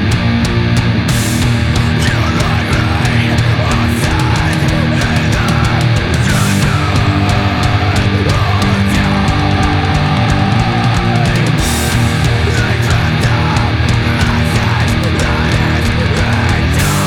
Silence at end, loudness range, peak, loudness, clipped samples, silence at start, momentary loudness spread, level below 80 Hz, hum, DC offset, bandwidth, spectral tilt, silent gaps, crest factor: 0 s; 0 LU; 0 dBFS; -12 LUFS; under 0.1%; 0 s; 1 LU; -22 dBFS; none; under 0.1%; 17.5 kHz; -5.5 dB/octave; none; 12 dB